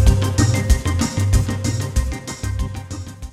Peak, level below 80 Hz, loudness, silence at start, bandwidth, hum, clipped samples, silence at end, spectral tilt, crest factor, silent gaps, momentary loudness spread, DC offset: -2 dBFS; -22 dBFS; -20 LUFS; 0 s; 15 kHz; none; under 0.1%; 0 s; -5.5 dB/octave; 16 dB; none; 11 LU; under 0.1%